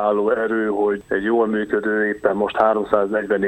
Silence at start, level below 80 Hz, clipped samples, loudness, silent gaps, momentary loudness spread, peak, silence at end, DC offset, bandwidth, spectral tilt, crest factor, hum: 0 s; -54 dBFS; under 0.1%; -20 LUFS; none; 3 LU; -2 dBFS; 0 s; under 0.1%; 8.4 kHz; -7.5 dB/octave; 16 dB; none